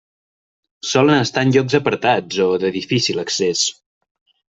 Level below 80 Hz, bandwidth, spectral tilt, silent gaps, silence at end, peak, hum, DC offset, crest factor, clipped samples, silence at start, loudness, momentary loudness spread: -58 dBFS; 8.2 kHz; -4 dB/octave; none; 0.85 s; -2 dBFS; none; under 0.1%; 18 dB; under 0.1%; 0.85 s; -17 LUFS; 5 LU